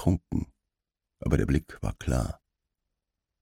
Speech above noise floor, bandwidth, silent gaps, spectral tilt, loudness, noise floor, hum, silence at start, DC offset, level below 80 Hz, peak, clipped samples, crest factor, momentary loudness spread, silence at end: 60 dB; 16 kHz; none; -7.5 dB/octave; -30 LUFS; -87 dBFS; none; 0 s; under 0.1%; -38 dBFS; -10 dBFS; under 0.1%; 22 dB; 11 LU; 1.1 s